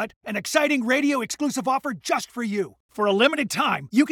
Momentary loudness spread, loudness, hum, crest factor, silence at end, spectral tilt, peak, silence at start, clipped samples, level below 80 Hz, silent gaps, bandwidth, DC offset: 8 LU; -23 LUFS; none; 20 dB; 0 s; -3.5 dB/octave; -2 dBFS; 0 s; under 0.1%; -68 dBFS; 0.16-0.21 s, 2.80-2.89 s; 18.5 kHz; under 0.1%